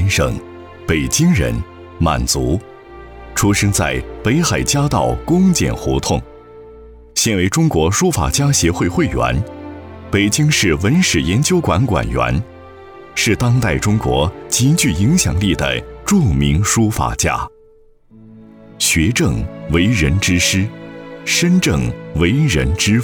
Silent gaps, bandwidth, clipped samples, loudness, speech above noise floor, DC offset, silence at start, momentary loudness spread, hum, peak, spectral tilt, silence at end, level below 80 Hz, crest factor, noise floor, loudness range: none; over 20 kHz; under 0.1%; -15 LUFS; 33 dB; under 0.1%; 0 s; 10 LU; none; -2 dBFS; -4.5 dB/octave; 0 s; -30 dBFS; 14 dB; -47 dBFS; 2 LU